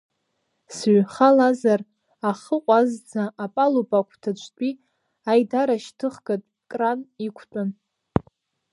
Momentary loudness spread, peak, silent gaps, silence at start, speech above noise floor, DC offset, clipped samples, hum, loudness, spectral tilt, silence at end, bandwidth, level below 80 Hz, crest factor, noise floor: 14 LU; -2 dBFS; none; 0.7 s; 53 dB; under 0.1%; under 0.1%; none; -23 LUFS; -6.5 dB/octave; 0.5 s; 11.5 kHz; -56 dBFS; 22 dB; -74 dBFS